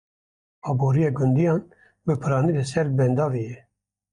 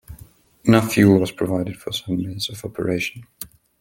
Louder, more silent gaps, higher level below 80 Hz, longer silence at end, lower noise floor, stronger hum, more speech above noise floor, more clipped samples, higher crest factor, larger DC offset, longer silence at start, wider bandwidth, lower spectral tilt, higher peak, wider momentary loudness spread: second, -23 LUFS vs -20 LUFS; neither; second, -56 dBFS vs -50 dBFS; first, 0.55 s vs 0.35 s; first, under -90 dBFS vs -48 dBFS; neither; first, over 69 dB vs 28 dB; neither; second, 14 dB vs 20 dB; neither; first, 0.65 s vs 0.1 s; second, 10.5 kHz vs 17 kHz; first, -8 dB/octave vs -6 dB/octave; second, -10 dBFS vs -2 dBFS; second, 11 LU vs 20 LU